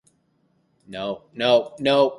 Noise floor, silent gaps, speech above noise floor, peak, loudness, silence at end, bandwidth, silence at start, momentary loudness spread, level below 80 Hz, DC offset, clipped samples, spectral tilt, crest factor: -66 dBFS; none; 45 dB; -4 dBFS; -22 LUFS; 0 s; 11 kHz; 0.9 s; 12 LU; -64 dBFS; under 0.1%; under 0.1%; -5.5 dB/octave; 18 dB